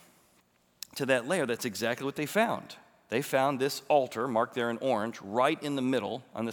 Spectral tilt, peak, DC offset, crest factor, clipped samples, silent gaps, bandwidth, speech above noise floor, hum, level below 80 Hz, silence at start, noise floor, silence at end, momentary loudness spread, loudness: -4.5 dB/octave; -12 dBFS; under 0.1%; 18 dB; under 0.1%; none; over 20 kHz; 38 dB; none; -80 dBFS; 0.95 s; -67 dBFS; 0 s; 9 LU; -30 LUFS